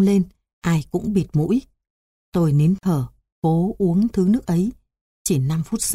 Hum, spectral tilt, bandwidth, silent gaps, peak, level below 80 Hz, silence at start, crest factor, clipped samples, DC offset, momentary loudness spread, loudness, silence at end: none; -7 dB/octave; 15.5 kHz; 0.53-0.62 s, 1.90-2.32 s, 3.32-3.42 s, 5.01-5.25 s; -8 dBFS; -46 dBFS; 0 s; 12 dB; under 0.1%; under 0.1%; 8 LU; -21 LUFS; 0 s